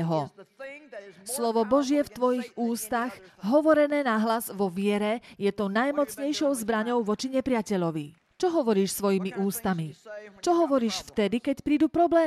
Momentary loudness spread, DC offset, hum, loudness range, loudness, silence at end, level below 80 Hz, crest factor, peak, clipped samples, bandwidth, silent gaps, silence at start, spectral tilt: 14 LU; under 0.1%; none; 2 LU; -27 LUFS; 0 s; -62 dBFS; 16 dB; -10 dBFS; under 0.1%; 15 kHz; none; 0 s; -5 dB/octave